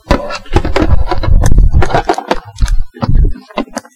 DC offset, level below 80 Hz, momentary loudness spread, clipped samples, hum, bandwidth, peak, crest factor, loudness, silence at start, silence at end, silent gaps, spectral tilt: under 0.1%; -12 dBFS; 8 LU; under 0.1%; none; 11.5 kHz; 0 dBFS; 10 dB; -14 LUFS; 0.1 s; 0.15 s; none; -6.5 dB/octave